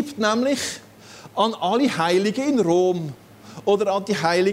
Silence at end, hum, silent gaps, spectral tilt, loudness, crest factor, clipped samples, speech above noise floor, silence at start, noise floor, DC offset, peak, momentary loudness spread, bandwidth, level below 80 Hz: 0 s; none; none; -4.5 dB/octave; -21 LUFS; 16 dB; under 0.1%; 24 dB; 0 s; -44 dBFS; under 0.1%; -4 dBFS; 10 LU; 16 kHz; -64 dBFS